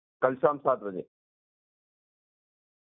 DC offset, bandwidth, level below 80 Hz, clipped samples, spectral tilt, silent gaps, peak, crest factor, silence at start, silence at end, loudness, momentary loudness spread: under 0.1%; 3.8 kHz; -78 dBFS; under 0.1%; -2 dB/octave; none; -8 dBFS; 26 dB; 0.2 s; 1.95 s; -28 LUFS; 13 LU